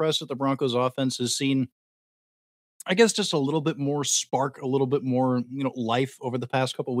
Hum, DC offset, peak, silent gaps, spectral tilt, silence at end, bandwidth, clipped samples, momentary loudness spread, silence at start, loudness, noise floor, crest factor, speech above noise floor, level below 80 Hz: none; under 0.1%; -6 dBFS; 1.72-2.80 s; -4 dB/octave; 0 s; 16 kHz; under 0.1%; 7 LU; 0 s; -25 LUFS; under -90 dBFS; 20 dB; over 65 dB; -80 dBFS